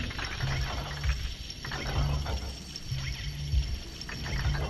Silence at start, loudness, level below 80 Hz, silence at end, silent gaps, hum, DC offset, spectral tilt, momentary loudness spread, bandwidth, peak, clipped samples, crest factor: 0 s; -34 LUFS; -34 dBFS; 0 s; none; none; under 0.1%; -4.5 dB/octave; 7 LU; 13.5 kHz; -16 dBFS; under 0.1%; 16 dB